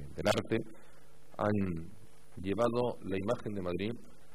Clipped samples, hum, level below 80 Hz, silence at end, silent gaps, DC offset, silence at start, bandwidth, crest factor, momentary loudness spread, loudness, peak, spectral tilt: under 0.1%; none; -58 dBFS; 0.25 s; none; 0.7%; 0 s; 15 kHz; 20 dB; 18 LU; -35 LUFS; -16 dBFS; -6 dB/octave